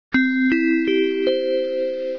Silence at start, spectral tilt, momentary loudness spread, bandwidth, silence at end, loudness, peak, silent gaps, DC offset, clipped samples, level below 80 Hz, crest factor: 0.1 s; -6 dB/octave; 5 LU; 5.4 kHz; 0 s; -20 LUFS; -10 dBFS; none; 0.3%; under 0.1%; -58 dBFS; 10 dB